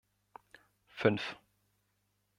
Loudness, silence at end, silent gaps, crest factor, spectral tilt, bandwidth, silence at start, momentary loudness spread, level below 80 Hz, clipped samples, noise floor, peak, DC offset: -34 LUFS; 1.05 s; none; 26 dB; -6.5 dB/octave; 12 kHz; 0.95 s; 25 LU; -76 dBFS; under 0.1%; -79 dBFS; -12 dBFS; under 0.1%